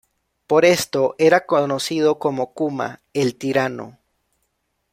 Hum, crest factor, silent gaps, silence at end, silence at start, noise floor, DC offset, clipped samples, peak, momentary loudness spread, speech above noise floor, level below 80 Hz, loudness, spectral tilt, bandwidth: none; 18 dB; none; 1.05 s; 0.5 s; -72 dBFS; under 0.1%; under 0.1%; -2 dBFS; 11 LU; 53 dB; -62 dBFS; -19 LUFS; -4.5 dB/octave; 16 kHz